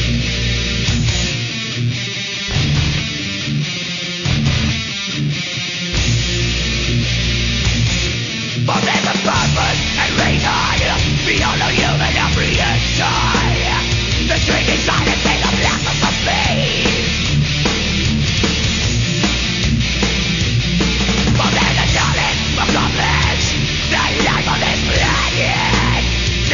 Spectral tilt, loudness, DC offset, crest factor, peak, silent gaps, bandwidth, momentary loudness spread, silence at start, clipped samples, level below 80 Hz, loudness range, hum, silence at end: -4 dB/octave; -15 LUFS; under 0.1%; 14 dB; -2 dBFS; none; 7.4 kHz; 5 LU; 0 s; under 0.1%; -24 dBFS; 3 LU; none; 0 s